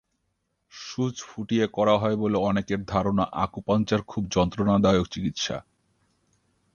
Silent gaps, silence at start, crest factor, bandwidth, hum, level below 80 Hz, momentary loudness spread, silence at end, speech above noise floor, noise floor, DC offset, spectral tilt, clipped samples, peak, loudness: none; 0.75 s; 20 dB; 7.2 kHz; none; -48 dBFS; 8 LU; 1.15 s; 51 dB; -76 dBFS; under 0.1%; -6 dB/octave; under 0.1%; -6 dBFS; -25 LUFS